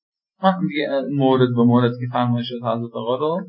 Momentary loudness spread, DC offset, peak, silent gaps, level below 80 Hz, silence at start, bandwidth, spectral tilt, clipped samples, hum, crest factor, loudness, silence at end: 9 LU; under 0.1%; -2 dBFS; none; -66 dBFS; 0.4 s; 5.4 kHz; -12.5 dB/octave; under 0.1%; none; 16 dB; -20 LUFS; 0 s